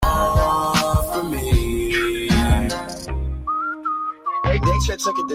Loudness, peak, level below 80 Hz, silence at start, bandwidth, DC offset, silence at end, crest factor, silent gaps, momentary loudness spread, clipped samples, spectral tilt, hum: -21 LUFS; -6 dBFS; -26 dBFS; 0 s; 16 kHz; under 0.1%; 0 s; 14 dB; none; 7 LU; under 0.1%; -5 dB/octave; none